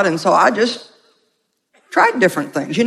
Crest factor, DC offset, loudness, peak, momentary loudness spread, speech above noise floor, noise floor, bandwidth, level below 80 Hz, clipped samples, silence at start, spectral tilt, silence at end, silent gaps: 16 dB; under 0.1%; -15 LUFS; 0 dBFS; 9 LU; 52 dB; -68 dBFS; 15.5 kHz; -66 dBFS; under 0.1%; 0 s; -4.5 dB/octave; 0 s; none